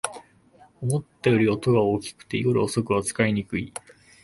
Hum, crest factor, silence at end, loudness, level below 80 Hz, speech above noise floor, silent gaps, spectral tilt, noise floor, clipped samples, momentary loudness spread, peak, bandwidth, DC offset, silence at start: none; 20 dB; 0.55 s; -24 LUFS; -54 dBFS; 32 dB; none; -6 dB/octave; -55 dBFS; under 0.1%; 11 LU; -6 dBFS; 11.5 kHz; under 0.1%; 0.05 s